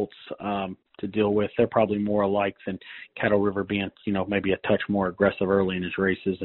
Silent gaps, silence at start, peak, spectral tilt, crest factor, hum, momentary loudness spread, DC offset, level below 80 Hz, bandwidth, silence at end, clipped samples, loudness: none; 0 s; -6 dBFS; -5 dB/octave; 20 dB; none; 12 LU; under 0.1%; -56 dBFS; 4.2 kHz; 0 s; under 0.1%; -25 LUFS